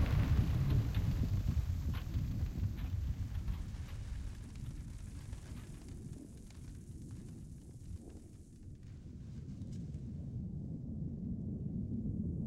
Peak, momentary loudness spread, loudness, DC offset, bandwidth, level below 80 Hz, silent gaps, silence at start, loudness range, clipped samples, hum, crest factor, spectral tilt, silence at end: -18 dBFS; 17 LU; -41 LUFS; under 0.1%; 16 kHz; -44 dBFS; none; 0 s; 13 LU; under 0.1%; none; 20 dB; -7.5 dB/octave; 0 s